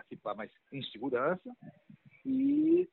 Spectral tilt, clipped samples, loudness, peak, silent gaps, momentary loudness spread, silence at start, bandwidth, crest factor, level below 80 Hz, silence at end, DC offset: -5 dB/octave; under 0.1%; -33 LUFS; -18 dBFS; none; 17 LU; 0.1 s; 4.3 kHz; 16 dB; -74 dBFS; 0.05 s; under 0.1%